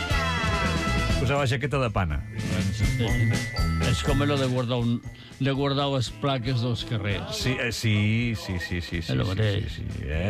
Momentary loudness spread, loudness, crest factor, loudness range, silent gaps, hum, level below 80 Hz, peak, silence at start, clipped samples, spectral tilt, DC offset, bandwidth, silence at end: 6 LU; -26 LUFS; 12 dB; 1 LU; none; none; -36 dBFS; -14 dBFS; 0 s; under 0.1%; -5.5 dB/octave; under 0.1%; 14.5 kHz; 0 s